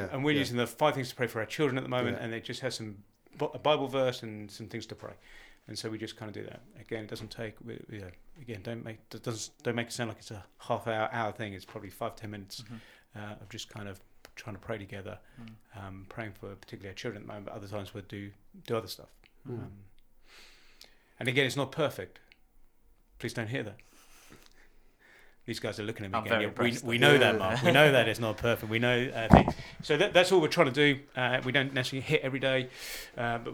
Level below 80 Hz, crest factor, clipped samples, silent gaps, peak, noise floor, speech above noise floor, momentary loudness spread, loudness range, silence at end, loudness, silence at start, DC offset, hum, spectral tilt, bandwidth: -52 dBFS; 32 dB; under 0.1%; none; 0 dBFS; -62 dBFS; 31 dB; 22 LU; 17 LU; 0 s; -30 LUFS; 0 s; under 0.1%; none; -5 dB/octave; 20 kHz